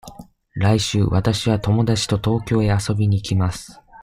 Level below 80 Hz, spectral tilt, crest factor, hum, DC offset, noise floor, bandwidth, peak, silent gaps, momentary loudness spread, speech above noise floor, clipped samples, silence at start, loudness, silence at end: -40 dBFS; -6 dB/octave; 16 dB; none; under 0.1%; -42 dBFS; 13 kHz; -2 dBFS; none; 4 LU; 23 dB; under 0.1%; 0.05 s; -19 LUFS; 0 s